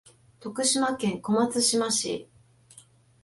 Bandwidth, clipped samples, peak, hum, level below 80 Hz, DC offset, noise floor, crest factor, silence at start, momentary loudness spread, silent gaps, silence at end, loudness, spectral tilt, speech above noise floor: 12 kHz; under 0.1%; -12 dBFS; none; -68 dBFS; under 0.1%; -56 dBFS; 16 dB; 0.4 s; 14 LU; none; 1 s; -25 LUFS; -2.5 dB/octave; 30 dB